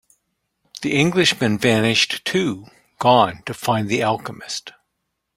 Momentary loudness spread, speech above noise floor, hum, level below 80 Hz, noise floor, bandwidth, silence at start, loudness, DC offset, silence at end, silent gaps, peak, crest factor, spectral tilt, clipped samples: 13 LU; 57 dB; none; -56 dBFS; -76 dBFS; 16 kHz; 0.75 s; -19 LUFS; under 0.1%; 0.65 s; none; -2 dBFS; 18 dB; -4.5 dB/octave; under 0.1%